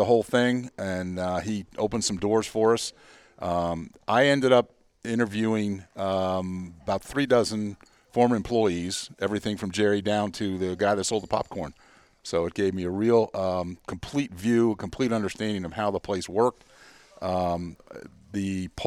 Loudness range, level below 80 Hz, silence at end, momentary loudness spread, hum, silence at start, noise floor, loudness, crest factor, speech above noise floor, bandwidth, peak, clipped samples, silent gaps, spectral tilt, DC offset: 3 LU; -54 dBFS; 0 s; 12 LU; none; 0 s; -52 dBFS; -26 LUFS; 20 dB; 27 dB; 14.5 kHz; -6 dBFS; under 0.1%; none; -5 dB/octave; under 0.1%